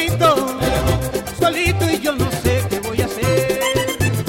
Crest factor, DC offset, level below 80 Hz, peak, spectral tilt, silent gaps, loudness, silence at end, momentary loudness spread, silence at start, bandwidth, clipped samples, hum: 14 dB; under 0.1%; -32 dBFS; -4 dBFS; -5 dB/octave; none; -18 LUFS; 0 s; 5 LU; 0 s; 16.5 kHz; under 0.1%; none